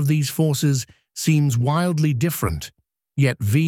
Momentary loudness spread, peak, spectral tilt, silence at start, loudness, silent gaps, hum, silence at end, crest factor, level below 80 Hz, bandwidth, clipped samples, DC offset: 12 LU; -6 dBFS; -6 dB/octave; 0 s; -21 LUFS; none; none; 0 s; 14 dB; -44 dBFS; 17 kHz; under 0.1%; under 0.1%